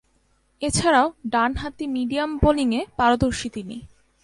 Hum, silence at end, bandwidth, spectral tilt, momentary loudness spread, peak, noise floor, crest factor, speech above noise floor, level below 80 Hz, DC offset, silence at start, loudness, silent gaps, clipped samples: none; 0.4 s; 11.5 kHz; -4.5 dB/octave; 12 LU; -4 dBFS; -64 dBFS; 18 dB; 42 dB; -38 dBFS; under 0.1%; 0.6 s; -22 LUFS; none; under 0.1%